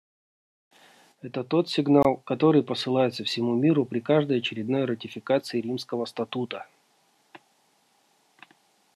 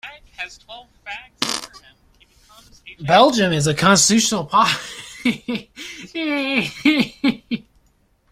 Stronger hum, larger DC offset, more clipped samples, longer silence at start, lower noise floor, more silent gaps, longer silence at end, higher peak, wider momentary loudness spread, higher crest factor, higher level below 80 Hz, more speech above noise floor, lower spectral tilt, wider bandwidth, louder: neither; neither; neither; first, 1.25 s vs 0.05 s; first, -66 dBFS vs -60 dBFS; neither; first, 1.6 s vs 0.75 s; second, -6 dBFS vs 0 dBFS; second, 11 LU vs 20 LU; about the same, 20 dB vs 20 dB; second, -64 dBFS vs -54 dBFS; about the same, 41 dB vs 41 dB; first, -6.5 dB/octave vs -3.5 dB/octave; second, 12.5 kHz vs 16 kHz; second, -25 LUFS vs -18 LUFS